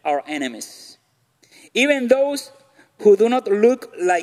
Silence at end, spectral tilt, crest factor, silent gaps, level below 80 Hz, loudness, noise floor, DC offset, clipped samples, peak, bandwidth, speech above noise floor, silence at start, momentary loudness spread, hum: 0 s; -4 dB/octave; 16 dB; none; -72 dBFS; -18 LUFS; -61 dBFS; under 0.1%; under 0.1%; -2 dBFS; 14.5 kHz; 43 dB; 0.05 s; 13 LU; none